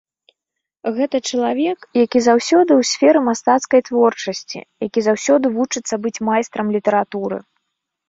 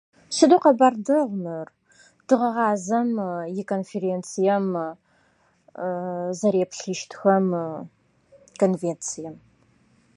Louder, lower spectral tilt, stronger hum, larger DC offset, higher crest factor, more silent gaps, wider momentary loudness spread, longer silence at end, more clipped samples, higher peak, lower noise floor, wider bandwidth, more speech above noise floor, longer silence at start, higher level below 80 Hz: first, -17 LUFS vs -23 LUFS; second, -4 dB/octave vs -5.5 dB/octave; neither; neither; about the same, 16 dB vs 20 dB; neither; second, 12 LU vs 15 LU; about the same, 0.7 s vs 0.8 s; neither; about the same, -2 dBFS vs -2 dBFS; first, -82 dBFS vs -63 dBFS; second, 7.8 kHz vs 11.5 kHz; first, 65 dB vs 41 dB; first, 0.85 s vs 0.3 s; first, -64 dBFS vs -74 dBFS